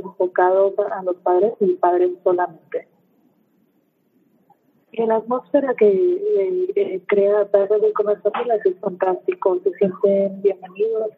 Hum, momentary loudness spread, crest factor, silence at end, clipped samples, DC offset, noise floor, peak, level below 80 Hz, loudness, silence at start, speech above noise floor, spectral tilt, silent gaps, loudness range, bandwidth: none; 7 LU; 16 dB; 0.05 s; under 0.1%; under 0.1%; -64 dBFS; -2 dBFS; -78 dBFS; -19 LUFS; 0 s; 45 dB; -9.5 dB/octave; none; 7 LU; 4 kHz